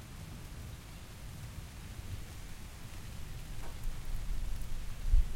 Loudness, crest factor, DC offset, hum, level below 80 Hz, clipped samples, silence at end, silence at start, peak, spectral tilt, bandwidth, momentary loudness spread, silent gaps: -45 LUFS; 20 dB; under 0.1%; none; -38 dBFS; under 0.1%; 0 s; 0 s; -16 dBFS; -4.5 dB/octave; 16 kHz; 6 LU; none